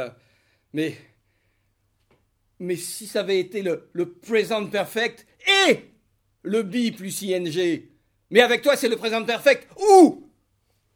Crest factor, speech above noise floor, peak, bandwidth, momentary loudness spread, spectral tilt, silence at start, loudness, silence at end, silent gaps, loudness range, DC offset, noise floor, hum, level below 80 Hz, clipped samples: 22 dB; 48 dB; -2 dBFS; 17.5 kHz; 14 LU; -3.5 dB/octave; 0 s; -21 LUFS; 0.75 s; none; 11 LU; under 0.1%; -69 dBFS; none; -68 dBFS; under 0.1%